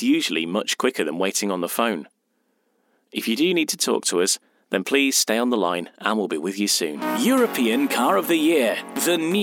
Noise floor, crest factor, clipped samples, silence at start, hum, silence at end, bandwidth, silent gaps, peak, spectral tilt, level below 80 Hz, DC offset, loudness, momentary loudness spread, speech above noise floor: -70 dBFS; 18 dB; under 0.1%; 0 s; none; 0 s; 17.5 kHz; none; -4 dBFS; -2.5 dB/octave; -84 dBFS; under 0.1%; -21 LUFS; 6 LU; 48 dB